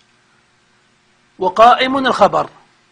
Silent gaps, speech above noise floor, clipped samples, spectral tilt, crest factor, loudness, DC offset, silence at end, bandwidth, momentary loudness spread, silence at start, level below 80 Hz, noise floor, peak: none; 44 dB; 0.2%; -4.5 dB/octave; 16 dB; -13 LUFS; under 0.1%; 0.45 s; 10 kHz; 12 LU; 1.4 s; -52 dBFS; -56 dBFS; 0 dBFS